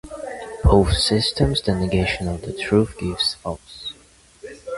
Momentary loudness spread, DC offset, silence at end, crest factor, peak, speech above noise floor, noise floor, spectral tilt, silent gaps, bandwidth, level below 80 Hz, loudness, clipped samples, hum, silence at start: 17 LU; under 0.1%; 0 s; 20 dB; 0 dBFS; 31 dB; -52 dBFS; -5.5 dB/octave; none; 11.5 kHz; -30 dBFS; -20 LUFS; under 0.1%; none; 0.05 s